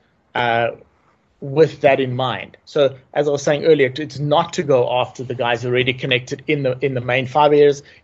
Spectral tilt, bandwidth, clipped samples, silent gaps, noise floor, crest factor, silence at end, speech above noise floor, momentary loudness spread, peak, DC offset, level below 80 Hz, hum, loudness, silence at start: -5.5 dB/octave; 7.8 kHz; under 0.1%; none; -59 dBFS; 16 dB; 0.2 s; 41 dB; 9 LU; -2 dBFS; under 0.1%; -56 dBFS; none; -18 LUFS; 0.35 s